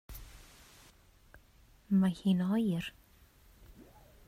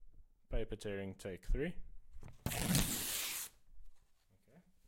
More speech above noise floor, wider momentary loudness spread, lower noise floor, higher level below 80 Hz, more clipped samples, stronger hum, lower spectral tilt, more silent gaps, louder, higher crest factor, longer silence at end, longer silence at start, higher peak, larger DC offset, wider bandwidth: about the same, 32 dB vs 32 dB; first, 25 LU vs 15 LU; second, -62 dBFS vs -70 dBFS; second, -58 dBFS vs -46 dBFS; neither; neither; first, -7.5 dB/octave vs -3.5 dB/octave; neither; first, -32 LUFS vs -40 LUFS; second, 16 dB vs 24 dB; first, 1.35 s vs 0.3 s; about the same, 0.1 s vs 0 s; about the same, -20 dBFS vs -18 dBFS; neither; about the same, 15.5 kHz vs 16.5 kHz